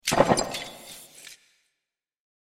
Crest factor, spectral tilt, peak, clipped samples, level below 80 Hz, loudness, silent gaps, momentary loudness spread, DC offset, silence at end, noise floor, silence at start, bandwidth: 24 dB; -3.5 dB/octave; -4 dBFS; under 0.1%; -52 dBFS; -24 LUFS; none; 24 LU; under 0.1%; 1.1 s; -84 dBFS; 0.05 s; 16.5 kHz